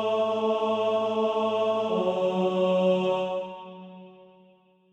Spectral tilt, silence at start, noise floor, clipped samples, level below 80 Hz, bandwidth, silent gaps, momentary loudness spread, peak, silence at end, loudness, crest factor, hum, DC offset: -7 dB/octave; 0 s; -59 dBFS; under 0.1%; -74 dBFS; 8.4 kHz; none; 16 LU; -12 dBFS; 0.7 s; -26 LUFS; 14 dB; none; under 0.1%